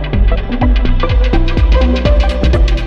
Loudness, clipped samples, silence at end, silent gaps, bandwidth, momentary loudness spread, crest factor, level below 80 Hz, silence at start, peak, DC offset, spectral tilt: -13 LUFS; under 0.1%; 0 s; none; 6.6 kHz; 3 LU; 8 dB; -10 dBFS; 0 s; -2 dBFS; under 0.1%; -7.5 dB/octave